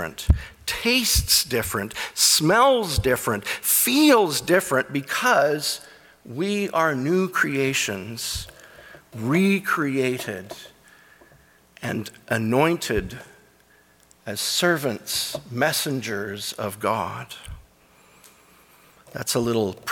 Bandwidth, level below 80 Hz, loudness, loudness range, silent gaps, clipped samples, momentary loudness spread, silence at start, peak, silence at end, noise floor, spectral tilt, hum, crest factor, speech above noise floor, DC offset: 19 kHz; -40 dBFS; -22 LUFS; 8 LU; none; under 0.1%; 15 LU; 0 s; -6 dBFS; 0 s; -57 dBFS; -3.5 dB/octave; none; 18 dB; 34 dB; under 0.1%